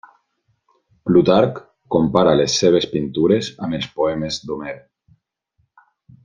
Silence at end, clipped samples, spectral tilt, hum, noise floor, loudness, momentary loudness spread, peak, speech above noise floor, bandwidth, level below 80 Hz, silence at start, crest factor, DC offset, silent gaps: 1.45 s; under 0.1%; -5.5 dB/octave; none; -68 dBFS; -18 LUFS; 14 LU; 0 dBFS; 51 dB; 9.6 kHz; -52 dBFS; 1.05 s; 18 dB; under 0.1%; none